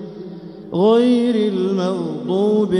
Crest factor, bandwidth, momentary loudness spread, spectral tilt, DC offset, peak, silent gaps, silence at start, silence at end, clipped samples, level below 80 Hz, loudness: 14 dB; 10.5 kHz; 19 LU; -7.5 dB/octave; under 0.1%; -4 dBFS; none; 0 s; 0 s; under 0.1%; -60 dBFS; -17 LUFS